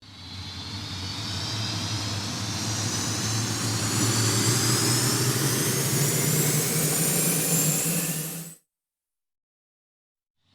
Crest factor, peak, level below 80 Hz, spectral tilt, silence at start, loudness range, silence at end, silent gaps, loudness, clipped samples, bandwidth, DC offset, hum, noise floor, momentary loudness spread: 18 dB; -10 dBFS; -58 dBFS; -3 dB/octave; 0 s; 6 LU; 2 s; none; -24 LUFS; under 0.1%; over 20 kHz; under 0.1%; none; -88 dBFS; 12 LU